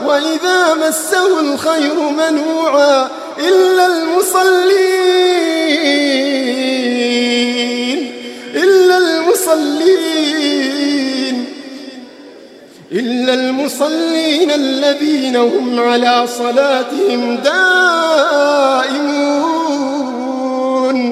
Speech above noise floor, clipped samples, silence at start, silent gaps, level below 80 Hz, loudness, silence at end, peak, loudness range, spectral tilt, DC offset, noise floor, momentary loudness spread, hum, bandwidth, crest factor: 26 dB; under 0.1%; 0 s; none; -70 dBFS; -13 LUFS; 0 s; 0 dBFS; 5 LU; -2 dB/octave; under 0.1%; -38 dBFS; 8 LU; none; 15.5 kHz; 12 dB